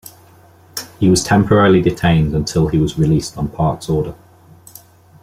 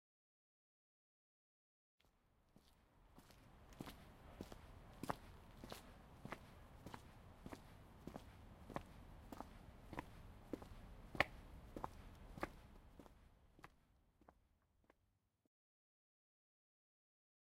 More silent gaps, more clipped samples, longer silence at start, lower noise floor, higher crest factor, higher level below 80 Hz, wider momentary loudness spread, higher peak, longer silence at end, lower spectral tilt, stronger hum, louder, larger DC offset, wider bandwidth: neither; neither; second, 0.05 s vs 2.05 s; second, -46 dBFS vs -84 dBFS; second, 14 dB vs 40 dB; first, -36 dBFS vs -66 dBFS; about the same, 14 LU vs 15 LU; first, -2 dBFS vs -16 dBFS; second, 1.1 s vs 2.55 s; about the same, -6 dB/octave vs -5 dB/octave; neither; first, -15 LUFS vs -54 LUFS; neither; about the same, 16 kHz vs 16 kHz